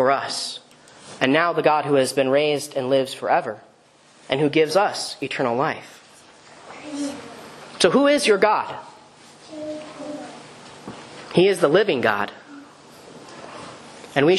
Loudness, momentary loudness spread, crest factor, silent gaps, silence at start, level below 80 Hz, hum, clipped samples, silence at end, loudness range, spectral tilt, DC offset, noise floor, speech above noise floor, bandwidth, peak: -20 LUFS; 23 LU; 22 dB; none; 0 s; -68 dBFS; none; under 0.1%; 0 s; 4 LU; -4.5 dB/octave; under 0.1%; -53 dBFS; 34 dB; 13 kHz; 0 dBFS